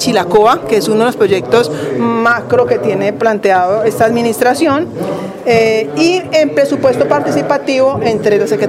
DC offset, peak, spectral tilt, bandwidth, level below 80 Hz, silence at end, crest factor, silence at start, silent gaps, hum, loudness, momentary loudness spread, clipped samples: under 0.1%; 0 dBFS; -5 dB/octave; 16 kHz; -50 dBFS; 0 s; 12 dB; 0 s; none; none; -12 LUFS; 4 LU; under 0.1%